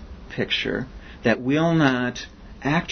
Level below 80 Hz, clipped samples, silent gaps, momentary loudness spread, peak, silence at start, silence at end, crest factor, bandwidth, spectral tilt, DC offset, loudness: -44 dBFS; under 0.1%; none; 16 LU; -4 dBFS; 0 s; 0 s; 20 dB; 6.6 kHz; -6 dB/octave; under 0.1%; -23 LUFS